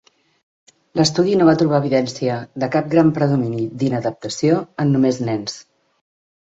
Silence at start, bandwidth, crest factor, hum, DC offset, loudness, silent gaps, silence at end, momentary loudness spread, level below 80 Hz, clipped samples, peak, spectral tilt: 0.95 s; 8 kHz; 18 dB; none; under 0.1%; -18 LUFS; none; 0.85 s; 10 LU; -58 dBFS; under 0.1%; -2 dBFS; -6 dB/octave